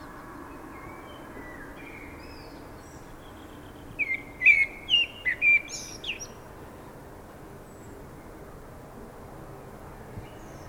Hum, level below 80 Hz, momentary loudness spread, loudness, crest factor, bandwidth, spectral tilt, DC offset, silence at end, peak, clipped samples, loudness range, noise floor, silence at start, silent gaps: none; -52 dBFS; 25 LU; -23 LUFS; 24 dB; over 20 kHz; -2 dB/octave; under 0.1%; 0 s; -8 dBFS; under 0.1%; 22 LU; -45 dBFS; 0 s; none